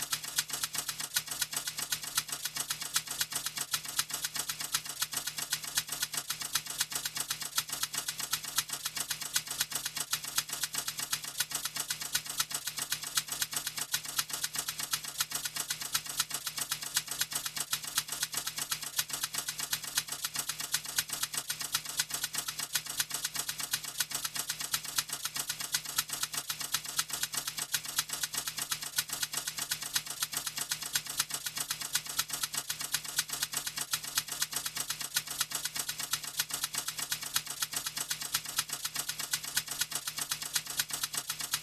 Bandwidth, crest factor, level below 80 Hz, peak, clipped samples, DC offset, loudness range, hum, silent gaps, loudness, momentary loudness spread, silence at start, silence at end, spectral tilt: 15.5 kHz; 26 dB; -68 dBFS; -10 dBFS; under 0.1%; under 0.1%; 0 LU; none; none; -33 LUFS; 3 LU; 0 s; 0 s; 1 dB/octave